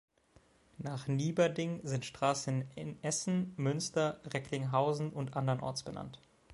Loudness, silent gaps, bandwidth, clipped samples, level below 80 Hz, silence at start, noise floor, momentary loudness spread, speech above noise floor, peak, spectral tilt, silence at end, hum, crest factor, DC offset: -35 LUFS; none; 11.5 kHz; under 0.1%; -68 dBFS; 0.8 s; -67 dBFS; 10 LU; 32 dB; -16 dBFS; -5.5 dB/octave; 0 s; none; 20 dB; under 0.1%